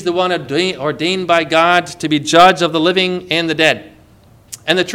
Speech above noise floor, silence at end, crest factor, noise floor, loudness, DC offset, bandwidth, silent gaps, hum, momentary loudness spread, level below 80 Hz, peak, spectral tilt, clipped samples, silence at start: 32 dB; 0 s; 14 dB; -46 dBFS; -14 LUFS; under 0.1%; 18 kHz; none; none; 9 LU; -52 dBFS; 0 dBFS; -4 dB/octave; 0.4%; 0 s